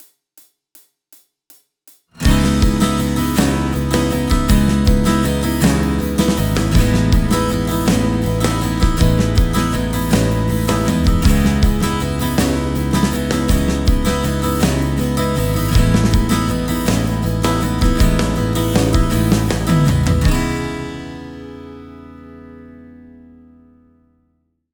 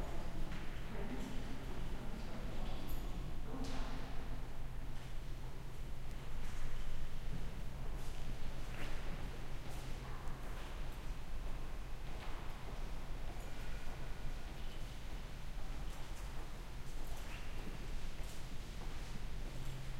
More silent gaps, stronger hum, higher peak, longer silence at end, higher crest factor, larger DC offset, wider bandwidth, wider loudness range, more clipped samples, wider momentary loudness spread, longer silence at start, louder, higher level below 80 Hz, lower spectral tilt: neither; neither; first, 0 dBFS vs -26 dBFS; first, 1.8 s vs 0 s; about the same, 16 dB vs 12 dB; neither; first, over 20 kHz vs 13.5 kHz; about the same, 4 LU vs 2 LU; neither; about the same, 4 LU vs 3 LU; first, 2.15 s vs 0 s; first, -16 LUFS vs -49 LUFS; first, -22 dBFS vs -42 dBFS; about the same, -6 dB/octave vs -5 dB/octave